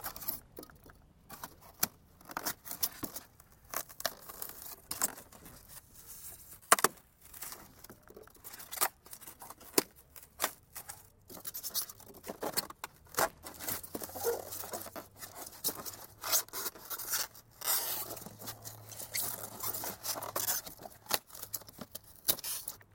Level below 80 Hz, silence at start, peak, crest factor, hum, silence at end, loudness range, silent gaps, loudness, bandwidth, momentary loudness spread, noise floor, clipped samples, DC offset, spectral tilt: -66 dBFS; 0 s; -6 dBFS; 34 dB; none; 0.1 s; 4 LU; none; -36 LUFS; 17 kHz; 19 LU; -59 dBFS; under 0.1%; under 0.1%; -1 dB/octave